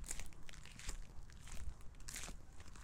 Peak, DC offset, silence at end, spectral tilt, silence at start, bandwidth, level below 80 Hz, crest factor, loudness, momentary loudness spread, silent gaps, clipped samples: -24 dBFS; under 0.1%; 0 s; -2.5 dB/octave; 0 s; 17.5 kHz; -52 dBFS; 22 dB; -53 LUFS; 9 LU; none; under 0.1%